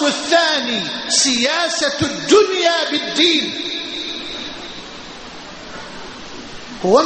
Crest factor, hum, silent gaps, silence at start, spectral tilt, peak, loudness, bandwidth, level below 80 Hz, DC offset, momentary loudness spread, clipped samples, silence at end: 18 dB; none; none; 0 s; -2 dB/octave; 0 dBFS; -16 LUFS; 8.8 kHz; -50 dBFS; under 0.1%; 19 LU; under 0.1%; 0 s